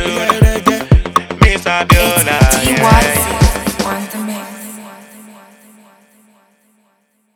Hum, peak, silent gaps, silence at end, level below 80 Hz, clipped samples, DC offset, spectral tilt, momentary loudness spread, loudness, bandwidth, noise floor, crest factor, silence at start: none; 0 dBFS; none; 2.2 s; -20 dBFS; under 0.1%; under 0.1%; -4.5 dB/octave; 14 LU; -12 LUFS; 19 kHz; -60 dBFS; 14 dB; 0 s